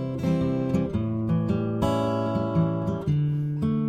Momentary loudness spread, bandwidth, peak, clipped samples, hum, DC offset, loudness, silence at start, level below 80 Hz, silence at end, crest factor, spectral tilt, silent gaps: 2 LU; 13 kHz; -10 dBFS; under 0.1%; none; under 0.1%; -26 LUFS; 0 s; -46 dBFS; 0 s; 14 dB; -9 dB/octave; none